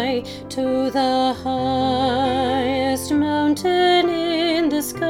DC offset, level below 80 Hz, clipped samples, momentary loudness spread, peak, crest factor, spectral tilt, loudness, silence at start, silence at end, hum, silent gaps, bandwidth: under 0.1%; -48 dBFS; under 0.1%; 6 LU; -4 dBFS; 16 dB; -4.5 dB/octave; -20 LUFS; 0 s; 0 s; none; none; 17.5 kHz